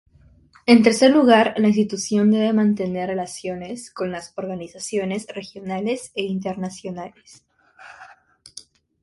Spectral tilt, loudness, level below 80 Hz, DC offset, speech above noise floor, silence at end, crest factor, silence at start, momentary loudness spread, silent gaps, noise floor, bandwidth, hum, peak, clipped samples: -5 dB/octave; -20 LUFS; -60 dBFS; under 0.1%; 33 dB; 1 s; 20 dB; 0.65 s; 18 LU; none; -53 dBFS; 11.5 kHz; none; 0 dBFS; under 0.1%